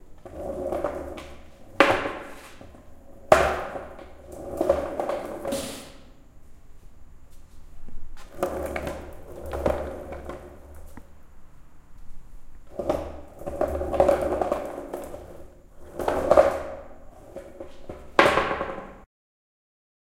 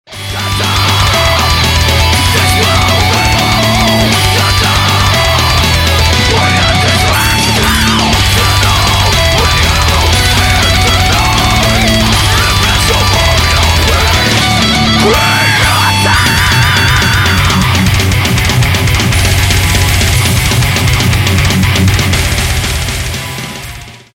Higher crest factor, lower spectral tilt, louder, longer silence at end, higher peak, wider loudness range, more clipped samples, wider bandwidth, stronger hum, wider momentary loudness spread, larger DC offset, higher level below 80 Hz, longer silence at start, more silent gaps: first, 28 dB vs 8 dB; first, -5 dB/octave vs -3.5 dB/octave; second, -26 LUFS vs -8 LUFS; first, 1 s vs 0.15 s; about the same, 0 dBFS vs 0 dBFS; first, 12 LU vs 2 LU; neither; about the same, 16.5 kHz vs 17 kHz; neither; first, 25 LU vs 2 LU; neither; second, -44 dBFS vs -18 dBFS; about the same, 0 s vs 0.1 s; neither